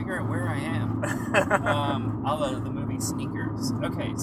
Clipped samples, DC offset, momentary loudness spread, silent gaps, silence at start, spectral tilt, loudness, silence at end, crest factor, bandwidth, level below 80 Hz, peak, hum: under 0.1%; under 0.1%; 6 LU; none; 0 s; -5.5 dB/octave; -27 LUFS; 0 s; 22 dB; 15.5 kHz; -50 dBFS; -6 dBFS; none